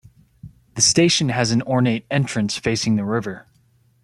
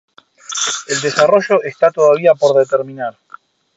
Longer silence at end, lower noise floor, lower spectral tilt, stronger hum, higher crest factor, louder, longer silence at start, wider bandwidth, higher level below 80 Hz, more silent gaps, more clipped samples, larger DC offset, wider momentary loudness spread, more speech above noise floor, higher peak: about the same, 0.65 s vs 0.65 s; first, -59 dBFS vs -42 dBFS; about the same, -4 dB/octave vs -3 dB/octave; neither; about the same, 18 dB vs 14 dB; second, -19 LUFS vs -14 LUFS; about the same, 0.45 s vs 0.5 s; first, 12.5 kHz vs 8.2 kHz; first, -52 dBFS vs -66 dBFS; neither; neither; neither; about the same, 11 LU vs 13 LU; first, 39 dB vs 29 dB; about the same, -2 dBFS vs 0 dBFS